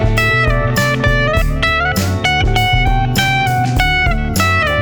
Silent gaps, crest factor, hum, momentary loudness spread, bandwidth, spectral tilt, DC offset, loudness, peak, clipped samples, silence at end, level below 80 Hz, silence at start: none; 12 dB; none; 2 LU; over 20 kHz; -4.5 dB/octave; under 0.1%; -14 LUFS; 0 dBFS; under 0.1%; 0 s; -20 dBFS; 0 s